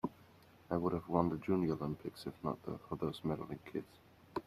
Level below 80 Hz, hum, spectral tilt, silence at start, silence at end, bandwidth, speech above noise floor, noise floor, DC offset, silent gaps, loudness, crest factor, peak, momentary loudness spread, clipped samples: -66 dBFS; none; -8.5 dB/octave; 0.05 s; 0.05 s; 14.5 kHz; 24 dB; -63 dBFS; under 0.1%; none; -39 LUFS; 24 dB; -16 dBFS; 11 LU; under 0.1%